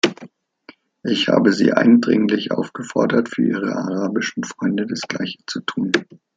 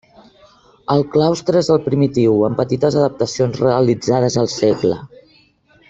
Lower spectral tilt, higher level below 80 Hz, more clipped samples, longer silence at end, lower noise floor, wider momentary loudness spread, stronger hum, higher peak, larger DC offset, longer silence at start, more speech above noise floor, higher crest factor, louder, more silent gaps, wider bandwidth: second, -5 dB/octave vs -6.5 dB/octave; second, -64 dBFS vs -52 dBFS; neither; second, 0.2 s vs 0.85 s; second, -48 dBFS vs -53 dBFS; first, 11 LU vs 4 LU; neither; about the same, -2 dBFS vs -2 dBFS; neither; second, 0.05 s vs 0.9 s; second, 30 dB vs 38 dB; about the same, 18 dB vs 14 dB; second, -19 LUFS vs -16 LUFS; neither; about the same, 7.8 kHz vs 8 kHz